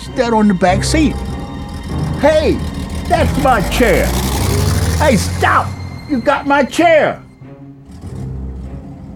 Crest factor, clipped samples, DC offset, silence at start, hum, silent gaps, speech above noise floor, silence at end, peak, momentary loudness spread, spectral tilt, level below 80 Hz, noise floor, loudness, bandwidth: 14 dB; under 0.1%; under 0.1%; 0 s; none; none; 22 dB; 0 s; 0 dBFS; 15 LU; -5.5 dB/octave; -24 dBFS; -35 dBFS; -14 LUFS; 19.5 kHz